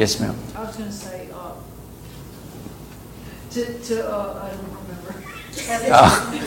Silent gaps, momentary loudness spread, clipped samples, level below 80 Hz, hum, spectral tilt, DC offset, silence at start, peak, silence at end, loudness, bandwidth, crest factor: none; 24 LU; under 0.1%; -42 dBFS; none; -4 dB/octave; under 0.1%; 0 s; 0 dBFS; 0 s; -20 LUFS; 17 kHz; 22 dB